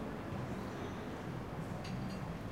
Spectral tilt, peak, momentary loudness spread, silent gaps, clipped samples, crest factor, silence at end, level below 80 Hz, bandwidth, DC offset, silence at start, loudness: -6.5 dB/octave; -28 dBFS; 2 LU; none; under 0.1%; 12 dB; 0 s; -56 dBFS; 16 kHz; under 0.1%; 0 s; -43 LUFS